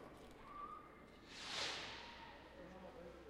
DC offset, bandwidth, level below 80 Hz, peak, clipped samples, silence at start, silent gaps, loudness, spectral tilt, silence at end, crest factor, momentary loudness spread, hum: under 0.1%; 15.5 kHz; -68 dBFS; -30 dBFS; under 0.1%; 0 s; none; -50 LUFS; -2 dB/octave; 0 s; 22 dB; 15 LU; none